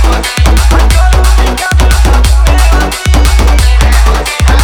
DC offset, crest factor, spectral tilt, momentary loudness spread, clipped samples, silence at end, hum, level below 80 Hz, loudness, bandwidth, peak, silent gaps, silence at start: under 0.1%; 6 dB; -4.5 dB/octave; 2 LU; 0.6%; 0 s; none; -6 dBFS; -8 LUFS; 15.5 kHz; 0 dBFS; none; 0 s